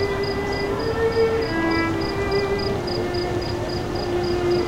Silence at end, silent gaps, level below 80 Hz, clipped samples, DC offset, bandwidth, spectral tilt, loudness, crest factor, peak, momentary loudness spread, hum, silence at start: 0 s; none; -36 dBFS; under 0.1%; under 0.1%; 16 kHz; -6 dB/octave; -23 LUFS; 12 dB; -10 dBFS; 5 LU; none; 0 s